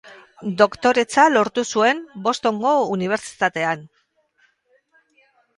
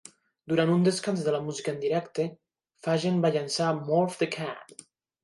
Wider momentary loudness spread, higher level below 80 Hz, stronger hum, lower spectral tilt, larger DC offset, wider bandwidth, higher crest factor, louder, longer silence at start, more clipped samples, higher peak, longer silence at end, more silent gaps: about the same, 9 LU vs 10 LU; first, -64 dBFS vs -74 dBFS; neither; second, -4 dB/octave vs -5.5 dB/octave; neither; about the same, 11.5 kHz vs 11.5 kHz; about the same, 20 dB vs 16 dB; first, -19 LUFS vs -28 LUFS; second, 0.05 s vs 0.45 s; neither; first, 0 dBFS vs -12 dBFS; first, 1.7 s vs 0.6 s; neither